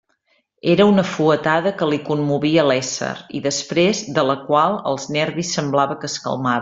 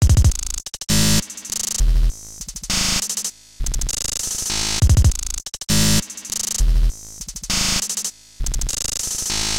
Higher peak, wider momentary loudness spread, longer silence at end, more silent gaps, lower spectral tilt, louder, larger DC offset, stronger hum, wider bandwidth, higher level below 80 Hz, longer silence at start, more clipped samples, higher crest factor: about the same, -2 dBFS vs -4 dBFS; second, 9 LU vs 12 LU; about the same, 0 s vs 0 s; neither; first, -5 dB/octave vs -3 dB/octave; about the same, -19 LUFS vs -20 LUFS; neither; neither; second, 7.8 kHz vs 17 kHz; second, -58 dBFS vs -22 dBFS; first, 0.65 s vs 0 s; neither; about the same, 18 dB vs 16 dB